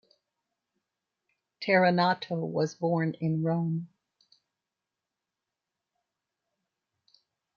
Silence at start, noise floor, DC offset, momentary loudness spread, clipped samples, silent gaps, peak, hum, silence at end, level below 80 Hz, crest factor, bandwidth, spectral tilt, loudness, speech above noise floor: 1.6 s; -88 dBFS; under 0.1%; 11 LU; under 0.1%; none; -10 dBFS; none; 3.7 s; -78 dBFS; 22 dB; 7 kHz; -7 dB/octave; -28 LUFS; 61 dB